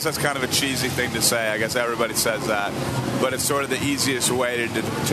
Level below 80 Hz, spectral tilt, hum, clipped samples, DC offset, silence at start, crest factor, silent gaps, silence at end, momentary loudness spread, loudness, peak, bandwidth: -50 dBFS; -3 dB/octave; none; under 0.1%; under 0.1%; 0 s; 18 dB; none; 0 s; 4 LU; -22 LUFS; -4 dBFS; 13.5 kHz